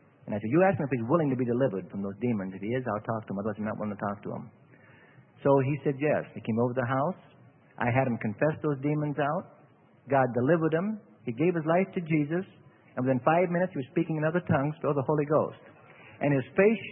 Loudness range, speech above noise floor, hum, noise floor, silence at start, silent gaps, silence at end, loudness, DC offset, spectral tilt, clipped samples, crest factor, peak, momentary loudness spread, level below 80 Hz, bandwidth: 3 LU; 31 dB; none; -59 dBFS; 0.25 s; none; 0 s; -28 LUFS; under 0.1%; -12 dB/octave; under 0.1%; 20 dB; -8 dBFS; 10 LU; -66 dBFS; 3.6 kHz